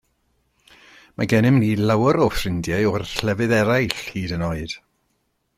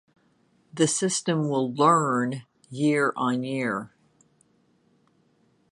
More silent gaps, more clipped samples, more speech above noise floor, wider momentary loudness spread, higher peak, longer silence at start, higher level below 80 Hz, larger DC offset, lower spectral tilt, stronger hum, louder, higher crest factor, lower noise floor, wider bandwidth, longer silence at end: neither; neither; first, 50 dB vs 41 dB; second, 11 LU vs 16 LU; first, -2 dBFS vs -6 dBFS; first, 1.2 s vs 0.75 s; first, -44 dBFS vs -74 dBFS; neither; first, -6 dB/octave vs -4.5 dB/octave; neither; first, -20 LUFS vs -24 LUFS; about the same, 20 dB vs 22 dB; first, -70 dBFS vs -65 dBFS; first, 16 kHz vs 11.5 kHz; second, 0.8 s vs 1.85 s